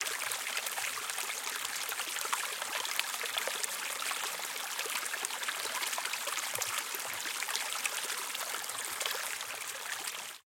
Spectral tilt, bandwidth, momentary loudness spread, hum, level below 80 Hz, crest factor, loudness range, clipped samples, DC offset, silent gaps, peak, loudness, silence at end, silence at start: 2 dB/octave; 17 kHz; 3 LU; none; under -90 dBFS; 28 dB; 1 LU; under 0.1%; under 0.1%; none; -8 dBFS; -34 LUFS; 0.2 s; 0 s